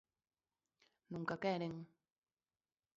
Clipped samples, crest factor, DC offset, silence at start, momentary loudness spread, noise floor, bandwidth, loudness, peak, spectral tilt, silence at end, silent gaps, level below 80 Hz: under 0.1%; 22 dB; under 0.1%; 1.1 s; 13 LU; under -90 dBFS; 7.4 kHz; -43 LUFS; -26 dBFS; -5 dB/octave; 1.1 s; none; -82 dBFS